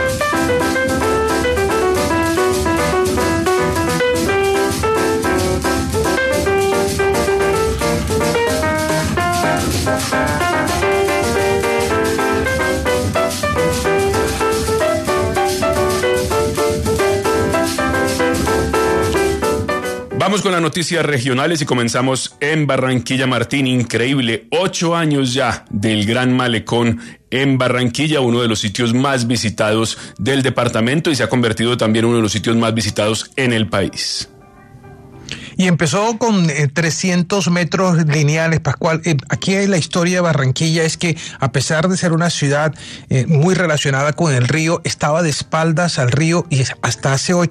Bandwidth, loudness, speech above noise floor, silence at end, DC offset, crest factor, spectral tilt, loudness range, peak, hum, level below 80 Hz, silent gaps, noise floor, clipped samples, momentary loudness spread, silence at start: 14 kHz; -16 LUFS; 26 dB; 0 s; under 0.1%; 14 dB; -5 dB/octave; 1 LU; -2 dBFS; none; -36 dBFS; none; -41 dBFS; under 0.1%; 3 LU; 0 s